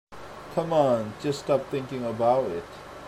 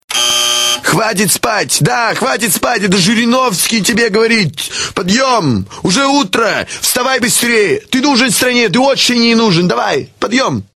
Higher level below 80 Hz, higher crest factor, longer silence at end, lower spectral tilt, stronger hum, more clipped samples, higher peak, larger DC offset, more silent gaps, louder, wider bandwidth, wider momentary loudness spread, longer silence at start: second, -58 dBFS vs -46 dBFS; first, 18 dB vs 12 dB; second, 0 s vs 0.15 s; first, -6.5 dB/octave vs -3 dB/octave; neither; neither; second, -10 dBFS vs 0 dBFS; neither; neither; second, -26 LUFS vs -11 LUFS; about the same, 14 kHz vs 13.5 kHz; first, 15 LU vs 5 LU; about the same, 0.1 s vs 0.1 s